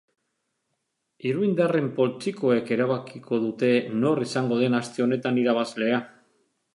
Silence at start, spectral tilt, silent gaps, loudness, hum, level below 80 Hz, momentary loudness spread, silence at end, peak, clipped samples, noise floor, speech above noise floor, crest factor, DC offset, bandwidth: 1.25 s; -6.5 dB/octave; none; -25 LUFS; none; -74 dBFS; 5 LU; 0.65 s; -8 dBFS; under 0.1%; -78 dBFS; 54 dB; 18 dB; under 0.1%; 11.5 kHz